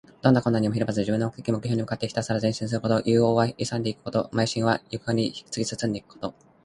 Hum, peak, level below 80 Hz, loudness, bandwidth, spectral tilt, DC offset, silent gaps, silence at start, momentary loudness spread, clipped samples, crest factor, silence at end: none; -4 dBFS; -56 dBFS; -25 LUFS; 11.5 kHz; -6 dB/octave; under 0.1%; none; 0.25 s; 9 LU; under 0.1%; 22 dB; 0.35 s